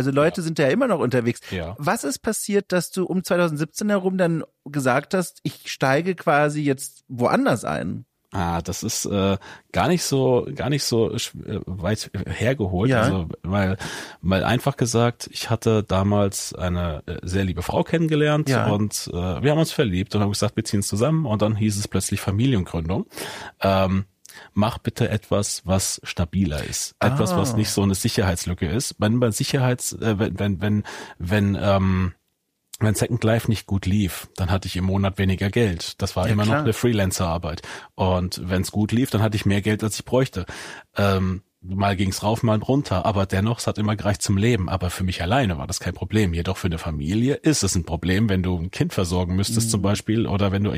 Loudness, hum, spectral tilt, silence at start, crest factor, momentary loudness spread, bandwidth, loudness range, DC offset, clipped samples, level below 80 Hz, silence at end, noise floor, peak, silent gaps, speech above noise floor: -22 LUFS; none; -5.5 dB/octave; 0 s; 14 dB; 7 LU; 15.5 kHz; 2 LU; under 0.1%; under 0.1%; -44 dBFS; 0 s; -73 dBFS; -8 dBFS; none; 52 dB